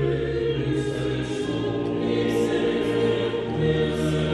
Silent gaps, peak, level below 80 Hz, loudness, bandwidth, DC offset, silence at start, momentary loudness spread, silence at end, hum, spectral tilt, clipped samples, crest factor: none; -12 dBFS; -42 dBFS; -24 LUFS; 12.5 kHz; under 0.1%; 0 s; 4 LU; 0 s; none; -6.5 dB/octave; under 0.1%; 12 dB